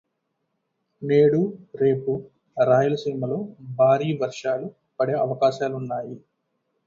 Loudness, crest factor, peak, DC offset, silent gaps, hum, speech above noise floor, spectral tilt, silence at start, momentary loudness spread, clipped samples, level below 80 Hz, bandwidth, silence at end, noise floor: -23 LUFS; 16 dB; -6 dBFS; under 0.1%; none; none; 54 dB; -7.5 dB/octave; 1 s; 14 LU; under 0.1%; -66 dBFS; 7.6 kHz; 0.7 s; -76 dBFS